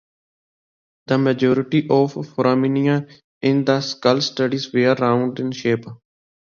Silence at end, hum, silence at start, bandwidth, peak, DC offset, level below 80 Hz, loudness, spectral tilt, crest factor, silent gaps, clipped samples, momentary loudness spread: 0.5 s; none; 1.1 s; 7.2 kHz; -2 dBFS; under 0.1%; -64 dBFS; -19 LUFS; -6.5 dB/octave; 18 dB; 3.24-3.41 s; under 0.1%; 6 LU